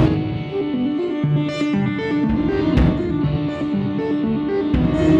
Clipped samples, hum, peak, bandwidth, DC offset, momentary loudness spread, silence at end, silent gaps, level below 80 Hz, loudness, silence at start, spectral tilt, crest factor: under 0.1%; none; -4 dBFS; 8 kHz; under 0.1%; 5 LU; 0 s; none; -30 dBFS; -20 LUFS; 0 s; -8.5 dB/octave; 14 dB